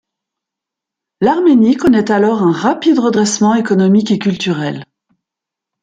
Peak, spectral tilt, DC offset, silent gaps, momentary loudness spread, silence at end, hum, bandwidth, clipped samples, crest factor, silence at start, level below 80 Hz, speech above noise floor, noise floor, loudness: -2 dBFS; -5.5 dB/octave; under 0.1%; none; 7 LU; 1 s; none; 9.4 kHz; under 0.1%; 12 dB; 1.2 s; -52 dBFS; 72 dB; -83 dBFS; -12 LUFS